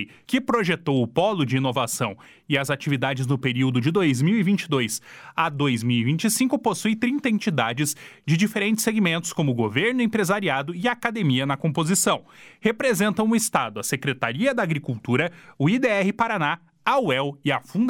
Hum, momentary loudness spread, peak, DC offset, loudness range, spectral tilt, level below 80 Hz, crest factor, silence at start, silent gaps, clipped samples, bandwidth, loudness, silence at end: none; 5 LU; -4 dBFS; under 0.1%; 1 LU; -5 dB/octave; -62 dBFS; 18 dB; 0 s; none; under 0.1%; 17.5 kHz; -23 LUFS; 0 s